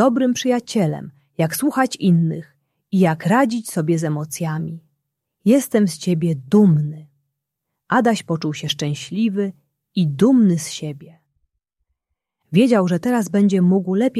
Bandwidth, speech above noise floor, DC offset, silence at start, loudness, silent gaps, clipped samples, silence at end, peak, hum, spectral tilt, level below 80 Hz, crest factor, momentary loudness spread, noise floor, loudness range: 14.5 kHz; 62 dB; under 0.1%; 0 s; -19 LUFS; none; under 0.1%; 0 s; -2 dBFS; none; -6.5 dB/octave; -62 dBFS; 16 dB; 12 LU; -79 dBFS; 2 LU